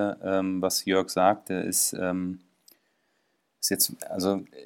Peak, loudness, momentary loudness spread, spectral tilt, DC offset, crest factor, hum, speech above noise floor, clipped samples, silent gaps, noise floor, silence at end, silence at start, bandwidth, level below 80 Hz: -8 dBFS; -26 LUFS; 6 LU; -3 dB/octave; under 0.1%; 20 dB; none; 46 dB; under 0.1%; none; -73 dBFS; 0 s; 0 s; 17 kHz; -72 dBFS